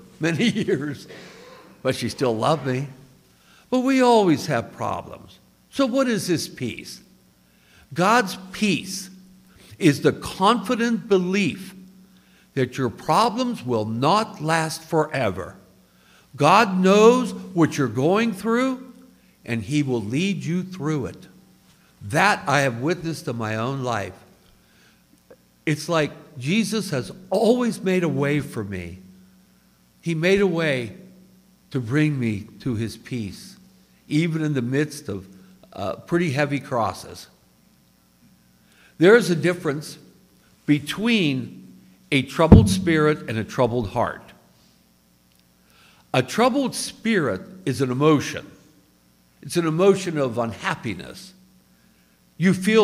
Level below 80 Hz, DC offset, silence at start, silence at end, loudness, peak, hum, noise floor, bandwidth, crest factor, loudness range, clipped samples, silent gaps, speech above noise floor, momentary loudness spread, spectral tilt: -44 dBFS; under 0.1%; 0.2 s; 0 s; -22 LUFS; 0 dBFS; none; -59 dBFS; 16 kHz; 22 dB; 7 LU; under 0.1%; none; 38 dB; 16 LU; -5.5 dB/octave